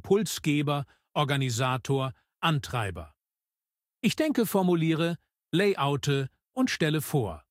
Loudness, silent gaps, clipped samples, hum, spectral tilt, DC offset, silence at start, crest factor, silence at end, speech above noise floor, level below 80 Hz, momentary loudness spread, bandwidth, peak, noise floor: -28 LUFS; none; under 0.1%; none; -5.5 dB/octave; under 0.1%; 0.05 s; 18 dB; 0.1 s; over 63 dB; -58 dBFS; 8 LU; 16 kHz; -10 dBFS; under -90 dBFS